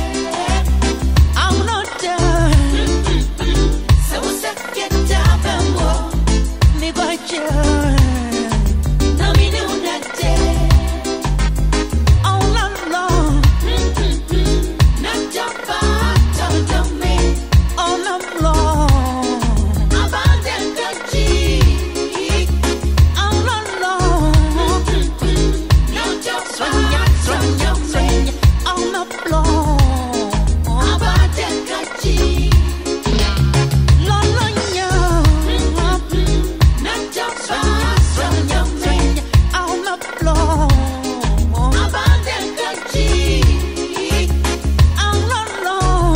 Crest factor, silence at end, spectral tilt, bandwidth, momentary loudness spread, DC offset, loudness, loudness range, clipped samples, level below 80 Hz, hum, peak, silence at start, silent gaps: 14 dB; 0 s; -5 dB/octave; 16.5 kHz; 6 LU; 0.3%; -16 LUFS; 1 LU; under 0.1%; -16 dBFS; none; 0 dBFS; 0 s; none